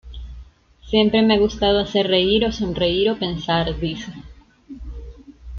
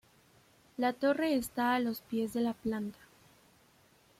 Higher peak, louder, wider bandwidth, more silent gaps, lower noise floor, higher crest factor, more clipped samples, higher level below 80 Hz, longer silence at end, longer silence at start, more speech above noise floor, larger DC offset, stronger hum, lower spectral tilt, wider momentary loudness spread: first, -4 dBFS vs -18 dBFS; first, -19 LUFS vs -33 LUFS; second, 7 kHz vs 16.5 kHz; neither; second, -44 dBFS vs -65 dBFS; about the same, 18 dB vs 18 dB; neither; first, -38 dBFS vs -68 dBFS; second, 0 s vs 1.25 s; second, 0.05 s vs 0.8 s; second, 25 dB vs 33 dB; neither; neither; about the same, -6 dB/octave vs -5 dB/octave; first, 22 LU vs 8 LU